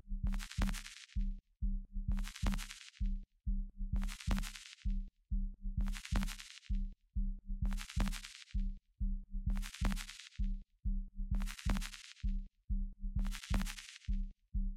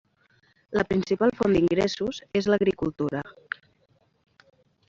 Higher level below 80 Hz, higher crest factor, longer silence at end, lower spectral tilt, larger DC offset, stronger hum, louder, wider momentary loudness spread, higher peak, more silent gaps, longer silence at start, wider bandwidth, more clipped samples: first, -38 dBFS vs -54 dBFS; about the same, 18 dB vs 20 dB; second, 0 s vs 1.6 s; second, -5 dB/octave vs -6.5 dB/octave; neither; neither; second, -43 LUFS vs -25 LUFS; second, 6 LU vs 15 LU; second, -20 dBFS vs -8 dBFS; first, 12.64-12.68 s vs none; second, 0.05 s vs 0.7 s; first, 14.5 kHz vs 7.6 kHz; neither